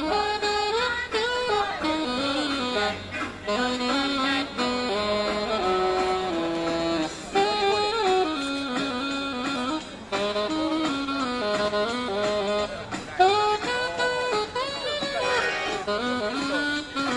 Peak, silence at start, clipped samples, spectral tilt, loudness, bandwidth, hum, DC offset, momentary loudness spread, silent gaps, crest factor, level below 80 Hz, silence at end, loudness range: -8 dBFS; 0 s; under 0.1%; -3.5 dB/octave; -25 LUFS; 11.5 kHz; none; under 0.1%; 5 LU; none; 18 dB; -52 dBFS; 0 s; 2 LU